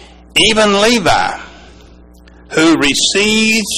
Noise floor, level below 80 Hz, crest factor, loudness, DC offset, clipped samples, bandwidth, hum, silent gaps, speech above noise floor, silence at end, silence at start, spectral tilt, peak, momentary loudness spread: -40 dBFS; -38 dBFS; 12 dB; -11 LUFS; under 0.1%; under 0.1%; 15.5 kHz; none; none; 29 dB; 0 s; 0 s; -2.5 dB/octave; 0 dBFS; 8 LU